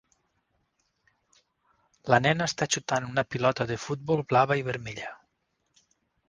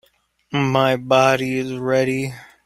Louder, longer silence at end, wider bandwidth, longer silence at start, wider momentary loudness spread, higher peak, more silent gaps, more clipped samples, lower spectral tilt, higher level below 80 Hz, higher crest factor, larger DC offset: second, -27 LUFS vs -19 LUFS; first, 1.15 s vs 0.2 s; second, 10 kHz vs 15 kHz; first, 2.05 s vs 0.5 s; first, 13 LU vs 10 LU; second, -6 dBFS vs -2 dBFS; neither; neither; about the same, -4.5 dB/octave vs -5.5 dB/octave; second, -62 dBFS vs -56 dBFS; first, 24 dB vs 18 dB; neither